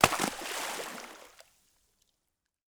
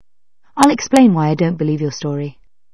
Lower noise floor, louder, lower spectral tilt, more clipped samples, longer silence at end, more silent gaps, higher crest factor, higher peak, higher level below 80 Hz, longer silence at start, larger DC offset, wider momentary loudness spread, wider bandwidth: first, -83 dBFS vs -66 dBFS; second, -33 LUFS vs -15 LUFS; second, -2.5 dB/octave vs -6 dB/octave; neither; first, 1.4 s vs 0.45 s; neither; first, 34 dB vs 16 dB; about the same, -2 dBFS vs 0 dBFS; second, -60 dBFS vs -52 dBFS; second, 0 s vs 0.55 s; second, under 0.1% vs 0.6%; first, 21 LU vs 14 LU; first, over 20 kHz vs 11 kHz